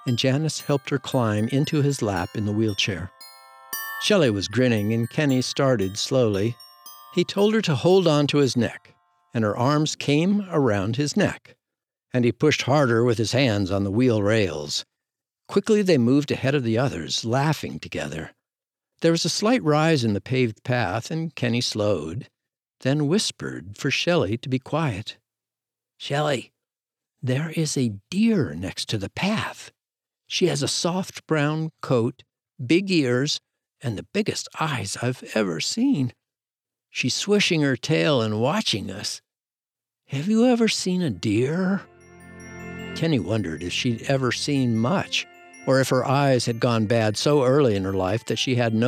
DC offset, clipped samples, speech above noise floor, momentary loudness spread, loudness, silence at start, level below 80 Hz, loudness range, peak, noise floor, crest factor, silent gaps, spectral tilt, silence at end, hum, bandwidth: under 0.1%; under 0.1%; over 68 dB; 11 LU; -23 LUFS; 0 s; -60 dBFS; 4 LU; -6 dBFS; under -90 dBFS; 16 dB; none; -5 dB/octave; 0 s; none; 17.5 kHz